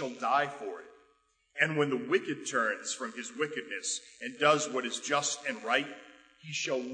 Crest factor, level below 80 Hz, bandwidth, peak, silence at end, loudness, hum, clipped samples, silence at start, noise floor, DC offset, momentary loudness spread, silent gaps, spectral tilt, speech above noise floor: 22 dB; -82 dBFS; 9.6 kHz; -10 dBFS; 0 s; -31 LUFS; none; under 0.1%; 0 s; -71 dBFS; under 0.1%; 15 LU; none; -2.5 dB/octave; 39 dB